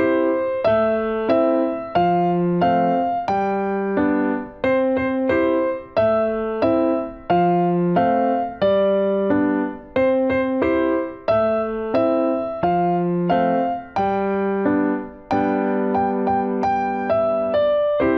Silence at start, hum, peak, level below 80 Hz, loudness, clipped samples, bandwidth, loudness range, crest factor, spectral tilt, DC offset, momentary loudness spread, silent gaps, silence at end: 0 s; none; -6 dBFS; -50 dBFS; -20 LUFS; under 0.1%; 6.2 kHz; 2 LU; 14 dB; -9 dB/octave; under 0.1%; 4 LU; none; 0 s